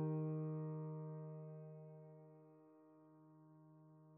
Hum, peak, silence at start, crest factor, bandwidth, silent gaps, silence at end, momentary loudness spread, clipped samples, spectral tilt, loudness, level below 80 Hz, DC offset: none; -34 dBFS; 0 s; 16 dB; 2.7 kHz; none; 0 s; 23 LU; under 0.1%; -11 dB/octave; -48 LUFS; under -90 dBFS; under 0.1%